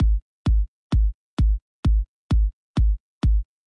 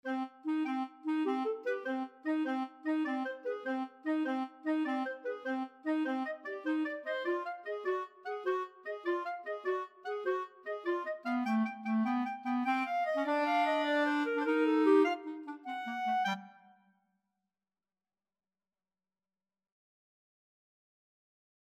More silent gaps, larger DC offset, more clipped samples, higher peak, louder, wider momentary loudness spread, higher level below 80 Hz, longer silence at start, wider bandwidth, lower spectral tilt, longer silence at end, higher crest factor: first, 0.22-0.45 s, 0.68-0.90 s, 1.14-1.37 s, 1.62-1.83 s, 2.08-2.30 s, 2.53-2.74 s, 3.00-3.21 s vs none; neither; neither; first, -12 dBFS vs -16 dBFS; first, -25 LUFS vs -34 LUFS; second, 2 LU vs 9 LU; first, -22 dBFS vs under -90 dBFS; about the same, 0 s vs 0.05 s; second, 5.8 kHz vs 8.6 kHz; first, -8.5 dB/octave vs -5.5 dB/octave; second, 0.25 s vs 5.2 s; second, 10 dB vs 18 dB